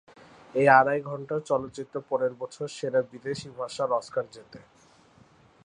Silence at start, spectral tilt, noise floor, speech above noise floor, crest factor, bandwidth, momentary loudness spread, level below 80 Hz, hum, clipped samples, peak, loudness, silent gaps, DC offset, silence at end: 0.55 s; -5.5 dB/octave; -58 dBFS; 31 dB; 24 dB; 10.5 kHz; 17 LU; -70 dBFS; none; under 0.1%; -4 dBFS; -27 LUFS; none; under 0.1%; 1.05 s